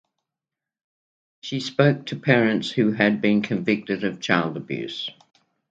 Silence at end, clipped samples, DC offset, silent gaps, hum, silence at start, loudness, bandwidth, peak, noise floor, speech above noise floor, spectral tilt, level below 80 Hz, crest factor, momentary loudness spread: 0.6 s; under 0.1%; under 0.1%; none; none; 1.45 s; -22 LUFS; 8 kHz; -2 dBFS; -88 dBFS; 66 dB; -6.5 dB/octave; -66 dBFS; 22 dB; 11 LU